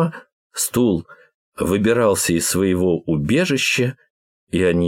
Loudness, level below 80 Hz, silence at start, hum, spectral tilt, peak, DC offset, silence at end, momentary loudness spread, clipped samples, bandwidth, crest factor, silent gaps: -19 LUFS; -46 dBFS; 0 s; none; -4.5 dB/octave; -4 dBFS; under 0.1%; 0 s; 8 LU; under 0.1%; 16.5 kHz; 14 dB; 0.32-0.50 s, 1.34-1.52 s, 4.10-4.47 s